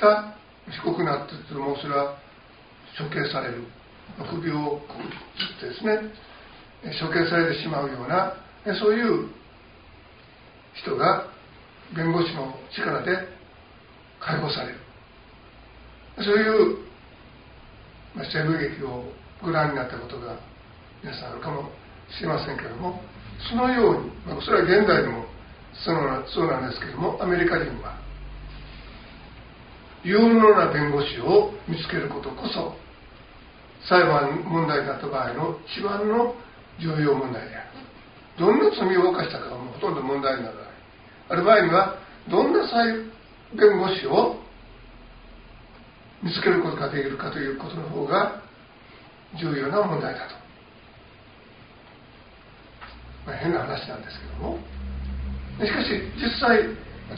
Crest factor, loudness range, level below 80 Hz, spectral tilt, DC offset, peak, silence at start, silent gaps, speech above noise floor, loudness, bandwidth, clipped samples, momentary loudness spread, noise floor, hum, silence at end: 22 dB; 10 LU; -46 dBFS; -4 dB/octave; under 0.1%; -4 dBFS; 0 s; none; 26 dB; -24 LUFS; 5.2 kHz; under 0.1%; 22 LU; -50 dBFS; none; 0 s